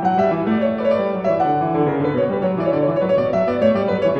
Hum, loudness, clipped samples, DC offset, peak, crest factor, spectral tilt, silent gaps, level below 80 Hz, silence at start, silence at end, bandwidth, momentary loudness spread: none; -18 LUFS; under 0.1%; under 0.1%; -4 dBFS; 14 dB; -9 dB/octave; none; -52 dBFS; 0 s; 0 s; 6.6 kHz; 2 LU